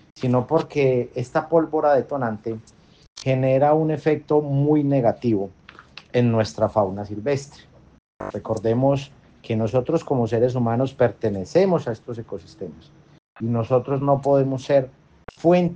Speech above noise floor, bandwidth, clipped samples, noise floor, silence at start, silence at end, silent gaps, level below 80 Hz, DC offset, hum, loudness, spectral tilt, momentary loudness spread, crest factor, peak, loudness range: 25 dB; 8.8 kHz; under 0.1%; -45 dBFS; 0.15 s; 0 s; 3.10-3.16 s, 8.00-8.19 s, 13.24-13.35 s; -56 dBFS; under 0.1%; none; -22 LUFS; -8 dB/octave; 14 LU; 18 dB; -4 dBFS; 4 LU